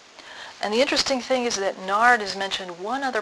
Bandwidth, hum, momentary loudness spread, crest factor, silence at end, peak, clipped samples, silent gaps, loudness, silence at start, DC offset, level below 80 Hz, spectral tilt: 11 kHz; none; 14 LU; 20 dB; 0 s; -2 dBFS; under 0.1%; none; -23 LUFS; 0.2 s; under 0.1%; -60 dBFS; -2 dB/octave